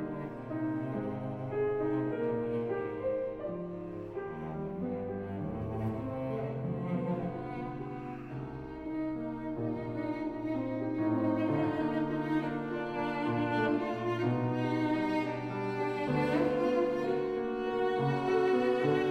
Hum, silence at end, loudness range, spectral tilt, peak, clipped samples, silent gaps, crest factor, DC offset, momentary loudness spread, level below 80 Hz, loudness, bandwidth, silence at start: none; 0 s; 6 LU; -8.5 dB/octave; -16 dBFS; under 0.1%; none; 16 dB; under 0.1%; 10 LU; -58 dBFS; -34 LUFS; 9 kHz; 0 s